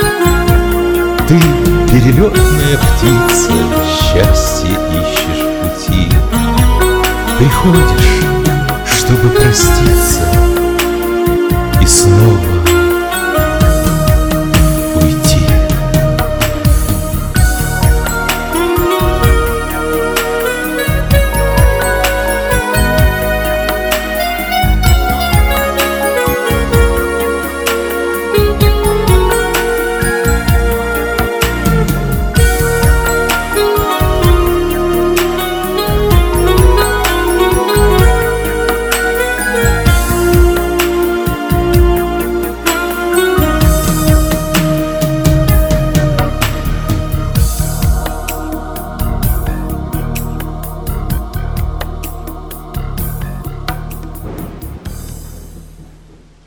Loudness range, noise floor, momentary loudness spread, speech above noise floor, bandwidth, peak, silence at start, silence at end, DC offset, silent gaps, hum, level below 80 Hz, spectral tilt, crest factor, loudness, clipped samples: 9 LU; -40 dBFS; 10 LU; 32 dB; over 20 kHz; 0 dBFS; 0 s; 0.55 s; under 0.1%; none; none; -16 dBFS; -5 dB/octave; 12 dB; -12 LUFS; 0.3%